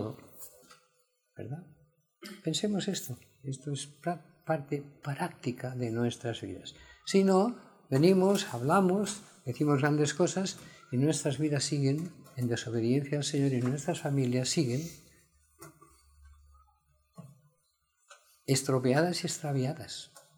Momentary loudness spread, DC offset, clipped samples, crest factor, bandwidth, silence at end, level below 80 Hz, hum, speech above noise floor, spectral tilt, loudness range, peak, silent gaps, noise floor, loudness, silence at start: 17 LU; under 0.1%; under 0.1%; 22 dB; 20 kHz; 0.2 s; -70 dBFS; none; 45 dB; -5.5 dB/octave; 9 LU; -10 dBFS; none; -75 dBFS; -31 LUFS; 0 s